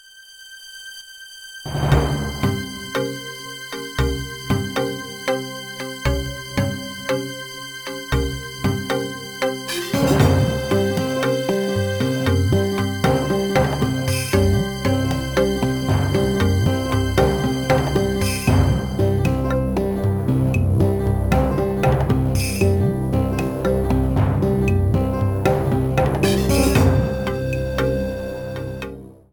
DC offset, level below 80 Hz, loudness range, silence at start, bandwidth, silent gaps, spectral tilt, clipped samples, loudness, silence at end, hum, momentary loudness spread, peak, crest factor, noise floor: under 0.1%; -30 dBFS; 6 LU; 0.15 s; 19 kHz; none; -6 dB/octave; under 0.1%; -20 LUFS; 0.2 s; none; 11 LU; -2 dBFS; 18 dB; -43 dBFS